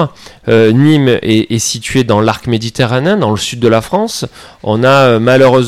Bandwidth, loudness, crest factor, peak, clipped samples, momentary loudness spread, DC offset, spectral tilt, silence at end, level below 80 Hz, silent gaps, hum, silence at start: 15.5 kHz; -11 LUFS; 10 dB; 0 dBFS; under 0.1%; 10 LU; under 0.1%; -5.5 dB/octave; 0 s; -42 dBFS; none; none; 0 s